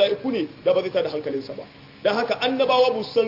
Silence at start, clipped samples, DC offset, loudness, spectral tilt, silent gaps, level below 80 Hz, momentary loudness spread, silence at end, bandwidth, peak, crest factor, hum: 0 s; under 0.1%; under 0.1%; -22 LUFS; -5.5 dB/octave; none; -66 dBFS; 11 LU; 0 s; 5.8 kHz; -6 dBFS; 16 dB; none